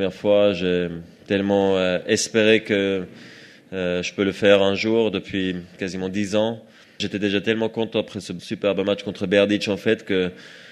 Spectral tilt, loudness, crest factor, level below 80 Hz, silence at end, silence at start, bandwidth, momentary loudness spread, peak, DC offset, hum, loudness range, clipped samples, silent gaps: -4.5 dB/octave; -21 LUFS; 20 dB; -60 dBFS; 0 s; 0 s; 12.5 kHz; 12 LU; -2 dBFS; under 0.1%; none; 4 LU; under 0.1%; none